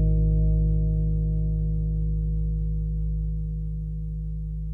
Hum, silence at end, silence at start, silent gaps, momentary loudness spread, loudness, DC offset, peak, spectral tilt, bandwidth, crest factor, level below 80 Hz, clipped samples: none; 0 s; 0 s; none; 9 LU; -27 LUFS; under 0.1%; -12 dBFS; -13.5 dB/octave; 0.7 kHz; 12 dB; -26 dBFS; under 0.1%